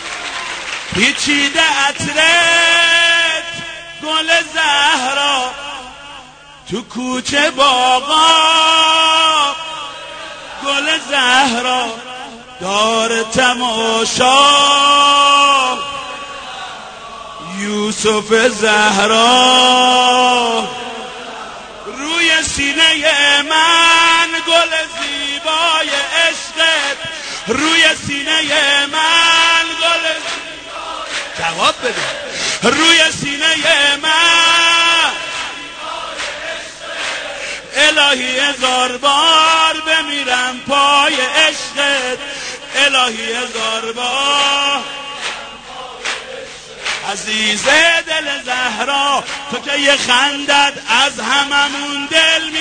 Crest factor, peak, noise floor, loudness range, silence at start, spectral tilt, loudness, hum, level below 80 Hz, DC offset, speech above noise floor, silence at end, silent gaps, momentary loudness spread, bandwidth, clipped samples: 14 dB; 0 dBFS; -38 dBFS; 5 LU; 0 s; -1 dB/octave; -12 LUFS; none; -48 dBFS; under 0.1%; 25 dB; 0 s; none; 17 LU; 9.6 kHz; under 0.1%